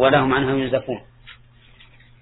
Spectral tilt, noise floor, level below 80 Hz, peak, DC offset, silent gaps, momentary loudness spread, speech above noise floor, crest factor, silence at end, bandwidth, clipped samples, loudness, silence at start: -9.5 dB/octave; -49 dBFS; -48 dBFS; -2 dBFS; under 0.1%; none; 15 LU; 31 dB; 20 dB; 0.9 s; 4.1 kHz; under 0.1%; -20 LUFS; 0 s